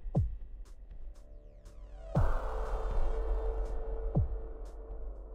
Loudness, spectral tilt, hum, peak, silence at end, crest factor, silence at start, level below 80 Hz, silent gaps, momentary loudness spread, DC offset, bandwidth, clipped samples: -37 LUFS; -9 dB/octave; none; -18 dBFS; 0 s; 16 dB; 0 s; -36 dBFS; none; 19 LU; under 0.1%; 5.4 kHz; under 0.1%